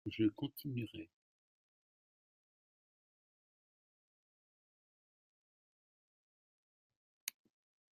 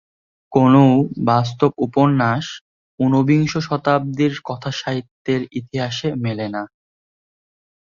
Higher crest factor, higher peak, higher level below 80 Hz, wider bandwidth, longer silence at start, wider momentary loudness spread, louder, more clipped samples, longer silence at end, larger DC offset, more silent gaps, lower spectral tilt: first, 28 dB vs 18 dB; second, -20 dBFS vs -2 dBFS; second, -82 dBFS vs -56 dBFS; first, 13.5 kHz vs 7.4 kHz; second, 0.05 s vs 0.5 s; first, 15 LU vs 12 LU; second, -42 LUFS vs -18 LUFS; neither; second, 0.65 s vs 1.25 s; neither; first, 1.13-6.90 s, 6.96-7.27 s vs 2.61-2.98 s, 5.11-5.25 s; second, -5.5 dB/octave vs -7 dB/octave